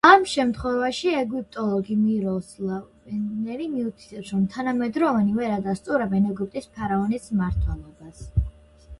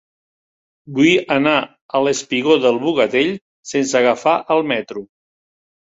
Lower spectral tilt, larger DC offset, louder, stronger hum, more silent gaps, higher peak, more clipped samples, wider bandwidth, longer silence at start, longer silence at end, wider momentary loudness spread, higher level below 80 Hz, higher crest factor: first, -6.5 dB/octave vs -4 dB/octave; neither; second, -25 LUFS vs -17 LUFS; neither; second, none vs 1.81-1.89 s, 3.41-3.63 s; about the same, -2 dBFS vs -2 dBFS; neither; first, 11.5 kHz vs 8 kHz; second, 0.05 s vs 0.85 s; second, 0.05 s vs 0.8 s; about the same, 9 LU vs 9 LU; first, -38 dBFS vs -60 dBFS; first, 22 dB vs 16 dB